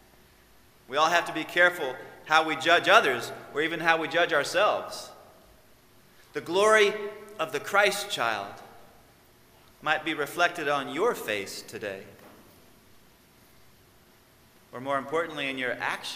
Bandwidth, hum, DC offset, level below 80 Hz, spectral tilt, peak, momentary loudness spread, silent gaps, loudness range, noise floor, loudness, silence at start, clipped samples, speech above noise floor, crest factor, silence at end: 16 kHz; none; under 0.1%; -70 dBFS; -2.5 dB/octave; -4 dBFS; 17 LU; none; 13 LU; -58 dBFS; -26 LUFS; 0.9 s; under 0.1%; 32 dB; 24 dB; 0 s